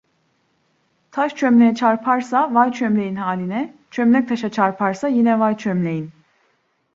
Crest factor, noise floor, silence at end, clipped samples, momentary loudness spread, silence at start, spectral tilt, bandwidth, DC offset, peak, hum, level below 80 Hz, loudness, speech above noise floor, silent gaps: 18 dB; -65 dBFS; 0.85 s; under 0.1%; 10 LU; 1.15 s; -7 dB/octave; 7.4 kHz; under 0.1%; -2 dBFS; none; -66 dBFS; -18 LUFS; 47 dB; none